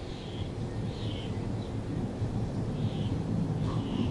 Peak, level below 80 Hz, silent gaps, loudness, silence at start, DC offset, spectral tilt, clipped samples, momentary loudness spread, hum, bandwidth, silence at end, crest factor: -16 dBFS; -44 dBFS; none; -34 LUFS; 0 s; under 0.1%; -7.5 dB/octave; under 0.1%; 5 LU; none; 11.5 kHz; 0 s; 16 dB